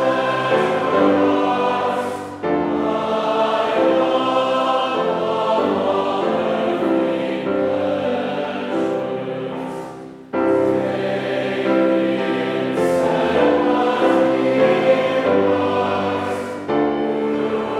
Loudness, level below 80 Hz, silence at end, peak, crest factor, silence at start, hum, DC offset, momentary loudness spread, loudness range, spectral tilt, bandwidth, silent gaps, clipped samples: -19 LUFS; -60 dBFS; 0 s; -2 dBFS; 16 dB; 0 s; none; under 0.1%; 7 LU; 5 LU; -6 dB/octave; 12 kHz; none; under 0.1%